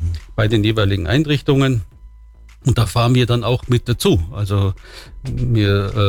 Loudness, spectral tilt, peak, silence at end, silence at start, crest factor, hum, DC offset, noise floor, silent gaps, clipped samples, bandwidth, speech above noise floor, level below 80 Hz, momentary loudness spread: -17 LUFS; -6.5 dB/octave; -4 dBFS; 0 s; 0 s; 12 dB; none; under 0.1%; -42 dBFS; none; under 0.1%; 17 kHz; 25 dB; -32 dBFS; 9 LU